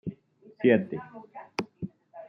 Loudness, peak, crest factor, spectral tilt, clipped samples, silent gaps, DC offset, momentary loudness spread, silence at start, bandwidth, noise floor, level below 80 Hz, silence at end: -28 LUFS; -8 dBFS; 22 dB; -7.5 dB/octave; under 0.1%; none; under 0.1%; 19 LU; 0.05 s; 10 kHz; -55 dBFS; -70 dBFS; 0.05 s